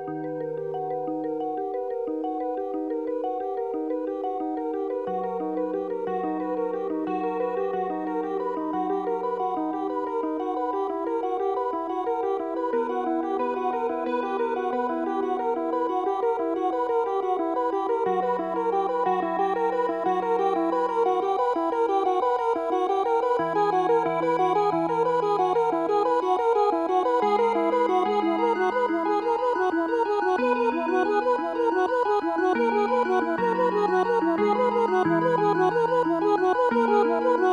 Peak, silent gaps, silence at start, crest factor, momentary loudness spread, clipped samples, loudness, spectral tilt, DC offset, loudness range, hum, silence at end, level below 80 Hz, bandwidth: -10 dBFS; none; 0 s; 14 dB; 7 LU; under 0.1%; -25 LUFS; -6.5 dB/octave; under 0.1%; 6 LU; none; 0 s; -66 dBFS; 9.8 kHz